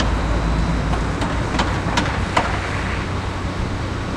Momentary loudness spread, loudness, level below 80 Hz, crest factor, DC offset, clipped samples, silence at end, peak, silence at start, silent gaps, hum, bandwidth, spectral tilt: 5 LU; -22 LUFS; -26 dBFS; 18 dB; under 0.1%; under 0.1%; 0 s; -2 dBFS; 0 s; none; none; 11 kHz; -5.5 dB/octave